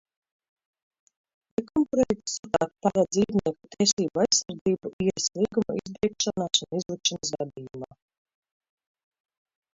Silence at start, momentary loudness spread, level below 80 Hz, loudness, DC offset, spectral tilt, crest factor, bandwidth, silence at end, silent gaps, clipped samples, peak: 1.6 s; 11 LU; -60 dBFS; -26 LUFS; under 0.1%; -3.5 dB/octave; 20 dB; 7.8 kHz; 1.9 s; 2.39-2.43 s, 3.93-3.97 s, 4.61-4.65 s, 4.93-4.99 s; under 0.1%; -8 dBFS